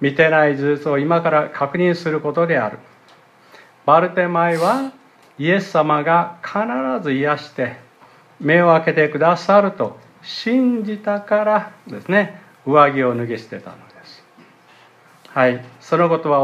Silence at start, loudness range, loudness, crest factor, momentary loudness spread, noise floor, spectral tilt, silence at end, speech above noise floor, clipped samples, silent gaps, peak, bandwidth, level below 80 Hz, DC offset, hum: 0 s; 3 LU; -17 LUFS; 18 dB; 12 LU; -50 dBFS; -7 dB/octave; 0 s; 32 dB; under 0.1%; none; 0 dBFS; 13 kHz; -70 dBFS; under 0.1%; none